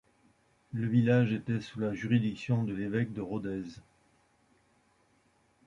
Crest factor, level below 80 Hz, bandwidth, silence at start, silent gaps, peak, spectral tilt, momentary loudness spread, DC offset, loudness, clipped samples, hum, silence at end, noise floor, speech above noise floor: 18 dB; -64 dBFS; 7.6 kHz; 0.75 s; none; -14 dBFS; -8.5 dB/octave; 12 LU; under 0.1%; -31 LUFS; under 0.1%; none; 1.9 s; -69 dBFS; 39 dB